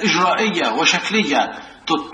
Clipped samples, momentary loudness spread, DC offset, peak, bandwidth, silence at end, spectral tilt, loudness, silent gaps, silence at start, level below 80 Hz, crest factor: under 0.1%; 8 LU; under 0.1%; -2 dBFS; 10 kHz; 0 s; -3 dB/octave; -17 LUFS; none; 0 s; -58 dBFS; 16 dB